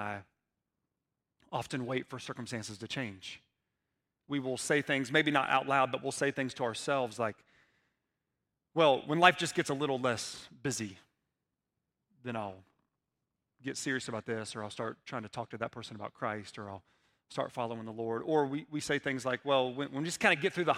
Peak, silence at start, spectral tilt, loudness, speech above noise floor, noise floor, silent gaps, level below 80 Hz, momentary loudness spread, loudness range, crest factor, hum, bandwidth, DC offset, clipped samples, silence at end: -6 dBFS; 0 s; -4 dB/octave; -33 LUFS; 54 dB; -88 dBFS; none; -76 dBFS; 15 LU; 10 LU; 28 dB; none; 16 kHz; under 0.1%; under 0.1%; 0 s